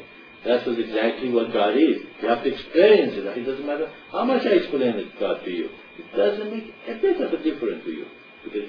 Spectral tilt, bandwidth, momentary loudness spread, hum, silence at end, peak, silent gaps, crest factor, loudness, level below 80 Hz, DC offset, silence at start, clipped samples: -7.5 dB/octave; 5.4 kHz; 15 LU; none; 0 s; -4 dBFS; none; 18 dB; -23 LUFS; -60 dBFS; under 0.1%; 0 s; under 0.1%